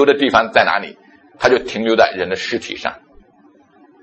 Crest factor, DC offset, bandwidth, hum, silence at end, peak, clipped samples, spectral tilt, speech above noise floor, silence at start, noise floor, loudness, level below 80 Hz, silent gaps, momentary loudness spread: 18 dB; under 0.1%; 8.4 kHz; none; 1.05 s; 0 dBFS; under 0.1%; -4 dB/octave; 35 dB; 0 s; -51 dBFS; -16 LUFS; -52 dBFS; none; 12 LU